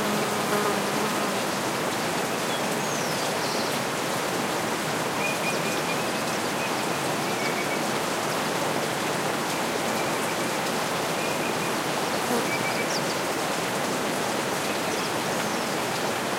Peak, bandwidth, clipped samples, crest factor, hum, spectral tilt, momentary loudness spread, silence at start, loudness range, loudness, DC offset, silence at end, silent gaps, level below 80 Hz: -12 dBFS; 16 kHz; under 0.1%; 14 dB; none; -3 dB/octave; 1 LU; 0 s; 0 LU; -26 LUFS; under 0.1%; 0 s; none; -64 dBFS